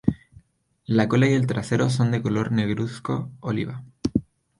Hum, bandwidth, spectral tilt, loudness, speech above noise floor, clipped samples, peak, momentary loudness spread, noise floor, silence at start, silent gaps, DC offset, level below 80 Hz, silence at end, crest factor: none; 11 kHz; -7 dB/octave; -24 LUFS; 39 dB; under 0.1%; -4 dBFS; 10 LU; -61 dBFS; 0.05 s; none; under 0.1%; -50 dBFS; 0.4 s; 20 dB